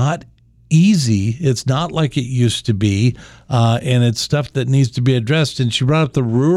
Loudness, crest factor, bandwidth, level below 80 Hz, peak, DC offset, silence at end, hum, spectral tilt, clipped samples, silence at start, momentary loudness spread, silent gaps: -16 LUFS; 12 dB; 12.5 kHz; -46 dBFS; -2 dBFS; under 0.1%; 0 s; none; -6 dB/octave; under 0.1%; 0 s; 5 LU; none